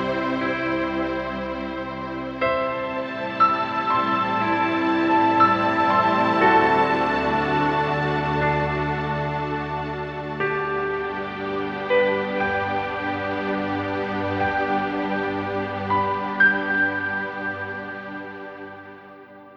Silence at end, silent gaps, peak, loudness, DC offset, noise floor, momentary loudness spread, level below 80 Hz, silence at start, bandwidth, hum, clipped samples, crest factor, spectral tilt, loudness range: 0 s; none; -6 dBFS; -22 LUFS; under 0.1%; -44 dBFS; 12 LU; -48 dBFS; 0 s; 7.6 kHz; none; under 0.1%; 18 dB; -7 dB/octave; 6 LU